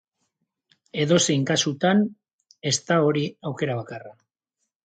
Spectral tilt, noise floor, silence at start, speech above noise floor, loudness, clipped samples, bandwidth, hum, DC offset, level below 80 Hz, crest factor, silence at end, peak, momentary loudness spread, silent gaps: -4.5 dB/octave; -80 dBFS; 0.95 s; 58 dB; -23 LUFS; under 0.1%; 9.6 kHz; none; under 0.1%; -68 dBFS; 20 dB; 0.7 s; -6 dBFS; 12 LU; 2.33-2.39 s